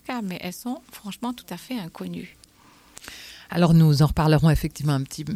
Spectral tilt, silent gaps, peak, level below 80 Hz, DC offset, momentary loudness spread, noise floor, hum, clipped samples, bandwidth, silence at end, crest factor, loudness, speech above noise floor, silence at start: -7 dB/octave; none; -8 dBFS; -40 dBFS; under 0.1%; 22 LU; -54 dBFS; none; under 0.1%; 15.5 kHz; 0 s; 16 dB; -23 LUFS; 32 dB; 0.1 s